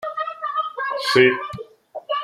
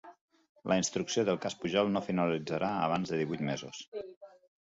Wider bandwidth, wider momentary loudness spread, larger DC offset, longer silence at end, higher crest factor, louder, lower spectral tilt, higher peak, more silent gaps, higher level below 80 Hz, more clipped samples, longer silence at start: first, 13 kHz vs 8 kHz; first, 21 LU vs 13 LU; neither; second, 0 s vs 0.4 s; about the same, 20 dB vs 20 dB; first, -20 LUFS vs -32 LUFS; about the same, -4.5 dB/octave vs -4.5 dB/octave; first, -2 dBFS vs -14 dBFS; second, none vs 0.21-0.28 s, 0.49-0.55 s, 3.88-3.92 s, 4.17-4.21 s; first, -62 dBFS vs -68 dBFS; neither; about the same, 0 s vs 0.05 s